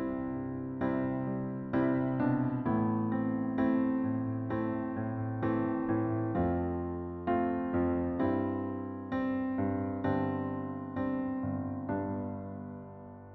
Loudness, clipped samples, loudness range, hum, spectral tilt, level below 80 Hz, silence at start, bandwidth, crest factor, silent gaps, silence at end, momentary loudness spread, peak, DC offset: -33 LUFS; under 0.1%; 3 LU; none; -9 dB/octave; -56 dBFS; 0 s; 4.2 kHz; 14 dB; none; 0 s; 8 LU; -18 dBFS; under 0.1%